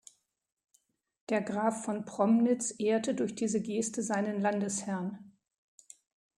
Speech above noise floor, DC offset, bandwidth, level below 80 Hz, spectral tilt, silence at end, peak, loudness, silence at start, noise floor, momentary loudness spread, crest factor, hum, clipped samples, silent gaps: 42 dB; under 0.1%; 11.5 kHz; -78 dBFS; -5 dB/octave; 1.1 s; -14 dBFS; -31 LUFS; 1.3 s; -73 dBFS; 10 LU; 18 dB; none; under 0.1%; none